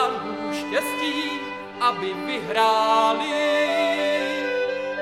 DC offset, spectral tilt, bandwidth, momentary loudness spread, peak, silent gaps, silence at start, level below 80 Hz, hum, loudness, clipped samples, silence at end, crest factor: under 0.1%; -3 dB/octave; 16 kHz; 9 LU; -6 dBFS; none; 0 s; -74 dBFS; none; -23 LUFS; under 0.1%; 0 s; 16 dB